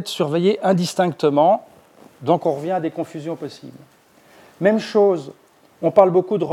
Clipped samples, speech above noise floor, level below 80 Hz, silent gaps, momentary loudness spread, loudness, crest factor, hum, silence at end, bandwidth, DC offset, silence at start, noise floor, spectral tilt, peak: under 0.1%; 33 dB; -72 dBFS; none; 14 LU; -19 LUFS; 20 dB; none; 0 s; 15 kHz; under 0.1%; 0 s; -51 dBFS; -6.5 dB/octave; 0 dBFS